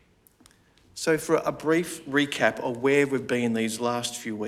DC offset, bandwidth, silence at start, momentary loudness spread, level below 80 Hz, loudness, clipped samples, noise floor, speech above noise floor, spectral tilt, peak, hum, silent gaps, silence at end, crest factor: under 0.1%; 16 kHz; 0.95 s; 6 LU; -64 dBFS; -26 LUFS; under 0.1%; -59 dBFS; 33 dB; -4.5 dB/octave; -6 dBFS; none; none; 0 s; 20 dB